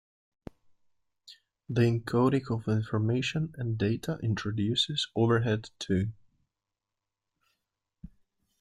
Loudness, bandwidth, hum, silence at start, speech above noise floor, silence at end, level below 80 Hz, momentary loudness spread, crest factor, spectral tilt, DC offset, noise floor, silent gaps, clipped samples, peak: -29 LUFS; 11.5 kHz; none; 1.3 s; 60 dB; 0.55 s; -60 dBFS; 6 LU; 18 dB; -6.5 dB/octave; under 0.1%; -88 dBFS; none; under 0.1%; -12 dBFS